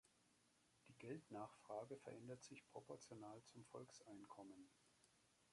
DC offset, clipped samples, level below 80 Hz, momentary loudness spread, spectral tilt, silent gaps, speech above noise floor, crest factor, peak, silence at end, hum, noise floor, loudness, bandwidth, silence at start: under 0.1%; under 0.1%; under -90 dBFS; 8 LU; -5 dB/octave; none; 21 dB; 20 dB; -40 dBFS; 0 s; none; -80 dBFS; -59 LUFS; 11.5 kHz; 0.05 s